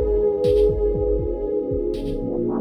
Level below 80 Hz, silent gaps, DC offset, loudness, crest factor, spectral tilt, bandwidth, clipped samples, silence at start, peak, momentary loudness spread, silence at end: -30 dBFS; none; under 0.1%; -22 LUFS; 12 dB; -9.5 dB/octave; 9.8 kHz; under 0.1%; 0 s; -8 dBFS; 7 LU; 0 s